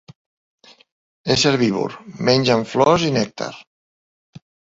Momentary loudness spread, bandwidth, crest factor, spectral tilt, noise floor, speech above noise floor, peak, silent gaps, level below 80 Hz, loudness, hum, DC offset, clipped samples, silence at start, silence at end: 14 LU; 8 kHz; 20 dB; -5 dB/octave; under -90 dBFS; over 72 dB; -2 dBFS; 3.67-4.33 s; -54 dBFS; -18 LUFS; none; under 0.1%; under 0.1%; 1.25 s; 0.3 s